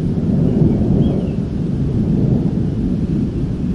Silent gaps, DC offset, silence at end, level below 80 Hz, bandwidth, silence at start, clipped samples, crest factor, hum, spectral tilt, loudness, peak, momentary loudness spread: none; 0.3%; 0 s; -28 dBFS; 7 kHz; 0 s; under 0.1%; 14 dB; none; -10.5 dB/octave; -17 LUFS; -2 dBFS; 6 LU